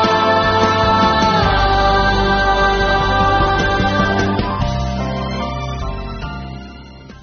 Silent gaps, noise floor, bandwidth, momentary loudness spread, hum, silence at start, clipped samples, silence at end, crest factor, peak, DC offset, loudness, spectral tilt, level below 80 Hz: none; -36 dBFS; 6.6 kHz; 13 LU; none; 0 s; under 0.1%; 0.05 s; 14 dB; -2 dBFS; under 0.1%; -15 LUFS; -3.5 dB/octave; -26 dBFS